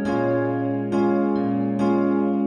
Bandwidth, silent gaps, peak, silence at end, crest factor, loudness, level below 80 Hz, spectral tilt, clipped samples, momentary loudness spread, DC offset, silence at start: 9.2 kHz; none; -10 dBFS; 0 s; 12 dB; -22 LUFS; -56 dBFS; -9 dB/octave; under 0.1%; 3 LU; under 0.1%; 0 s